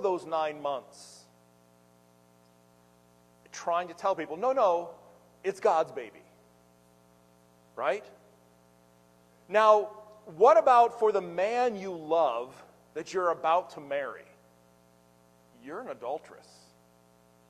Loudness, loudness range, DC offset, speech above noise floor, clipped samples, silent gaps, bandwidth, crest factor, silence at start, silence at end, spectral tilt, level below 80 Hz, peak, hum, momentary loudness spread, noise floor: -28 LUFS; 16 LU; under 0.1%; 34 dB; under 0.1%; none; 13.5 kHz; 22 dB; 0 s; 1.15 s; -4.5 dB/octave; -78 dBFS; -8 dBFS; 60 Hz at -65 dBFS; 22 LU; -62 dBFS